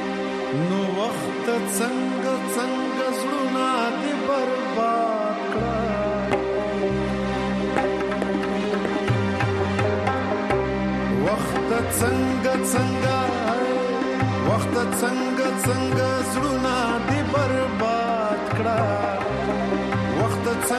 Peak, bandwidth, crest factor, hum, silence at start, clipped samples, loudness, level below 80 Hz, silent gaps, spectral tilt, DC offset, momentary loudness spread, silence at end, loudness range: -6 dBFS; 13.5 kHz; 16 dB; none; 0 s; under 0.1%; -23 LUFS; -44 dBFS; none; -5.5 dB/octave; under 0.1%; 3 LU; 0 s; 2 LU